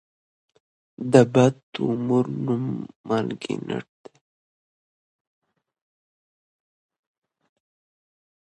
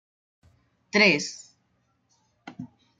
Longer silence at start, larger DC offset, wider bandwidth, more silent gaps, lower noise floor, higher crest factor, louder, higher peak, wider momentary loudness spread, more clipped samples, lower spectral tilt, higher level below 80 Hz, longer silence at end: about the same, 1 s vs 0.95 s; neither; about the same, 9.6 kHz vs 9.4 kHz; first, 1.63-1.73 s, 2.96-3.04 s vs none; first, under -90 dBFS vs -71 dBFS; about the same, 26 dB vs 22 dB; about the same, -23 LUFS vs -22 LUFS; first, 0 dBFS vs -6 dBFS; second, 15 LU vs 25 LU; neither; first, -7 dB/octave vs -3.5 dB/octave; first, -66 dBFS vs -72 dBFS; first, 4.65 s vs 0.35 s